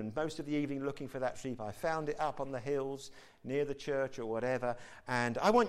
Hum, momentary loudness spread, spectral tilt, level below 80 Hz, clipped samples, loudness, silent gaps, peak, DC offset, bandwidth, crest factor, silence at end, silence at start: none; 7 LU; -5.5 dB/octave; -60 dBFS; under 0.1%; -37 LUFS; none; -16 dBFS; under 0.1%; 15 kHz; 18 dB; 0 s; 0 s